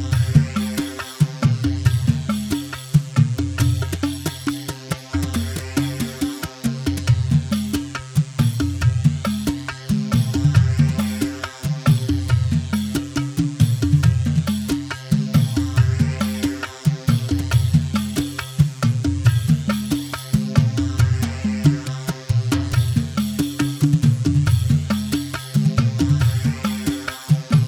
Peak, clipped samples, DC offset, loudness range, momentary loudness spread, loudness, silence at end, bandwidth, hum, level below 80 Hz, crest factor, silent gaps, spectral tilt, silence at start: -2 dBFS; under 0.1%; under 0.1%; 3 LU; 7 LU; -20 LUFS; 0 s; 17.5 kHz; none; -36 dBFS; 18 dB; none; -6 dB/octave; 0 s